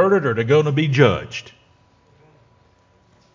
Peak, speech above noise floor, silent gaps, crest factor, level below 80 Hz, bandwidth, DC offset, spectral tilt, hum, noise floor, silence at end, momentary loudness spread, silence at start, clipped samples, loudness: 0 dBFS; 39 dB; none; 20 dB; -50 dBFS; 7.6 kHz; under 0.1%; -7 dB/octave; none; -57 dBFS; 1.85 s; 14 LU; 0 s; under 0.1%; -17 LUFS